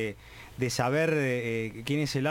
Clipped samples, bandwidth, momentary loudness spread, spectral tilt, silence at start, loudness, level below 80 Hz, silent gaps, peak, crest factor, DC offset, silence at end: under 0.1%; 17 kHz; 11 LU; -5.5 dB/octave; 0 s; -29 LUFS; -56 dBFS; none; -14 dBFS; 16 dB; under 0.1%; 0 s